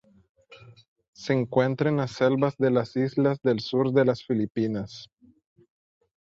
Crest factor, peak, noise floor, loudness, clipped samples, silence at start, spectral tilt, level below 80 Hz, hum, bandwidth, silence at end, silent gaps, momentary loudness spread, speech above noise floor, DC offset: 18 dB; -8 dBFS; -51 dBFS; -25 LUFS; under 0.1%; 0.5 s; -7.5 dB/octave; -64 dBFS; none; 7.6 kHz; 1.25 s; 0.88-0.96 s, 1.08-1.13 s; 6 LU; 27 dB; under 0.1%